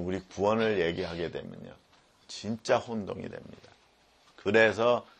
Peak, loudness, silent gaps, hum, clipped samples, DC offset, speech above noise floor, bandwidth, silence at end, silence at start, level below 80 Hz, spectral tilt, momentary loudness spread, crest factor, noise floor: -10 dBFS; -29 LUFS; none; none; under 0.1%; under 0.1%; 34 dB; 9.6 kHz; 0.15 s; 0 s; -62 dBFS; -5 dB/octave; 21 LU; 22 dB; -64 dBFS